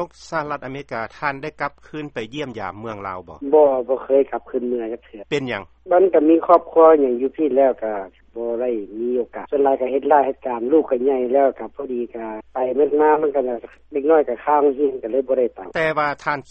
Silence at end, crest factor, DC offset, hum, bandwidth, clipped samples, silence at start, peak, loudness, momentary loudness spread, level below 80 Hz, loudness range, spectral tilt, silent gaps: 0.1 s; 18 dB; under 0.1%; none; 8 kHz; under 0.1%; 0 s; 0 dBFS; -19 LUFS; 14 LU; -56 dBFS; 5 LU; -7 dB/octave; none